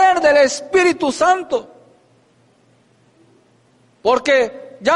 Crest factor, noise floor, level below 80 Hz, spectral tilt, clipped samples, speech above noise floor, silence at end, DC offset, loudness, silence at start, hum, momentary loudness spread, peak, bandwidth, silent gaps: 14 dB; -55 dBFS; -56 dBFS; -2.5 dB/octave; under 0.1%; 39 dB; 0 s; under 0.1%; -16 LUFS; 0 s; none; 11 LU; -4 dBFS; 11.5 kHz; none